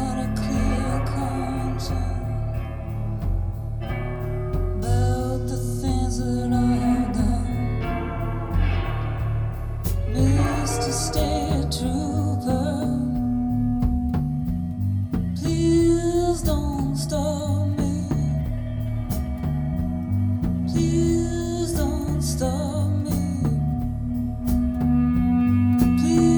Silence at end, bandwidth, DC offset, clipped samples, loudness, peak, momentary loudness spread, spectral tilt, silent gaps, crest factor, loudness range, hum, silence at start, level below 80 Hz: 0 s; over 20 kHz; under 0.1%; under 0.1%; -24 LUFS; -6 dBFS; 7 LU; -7 dB/octave; none; 16 dB; 4 LU; none; 0 s; -30 dBFS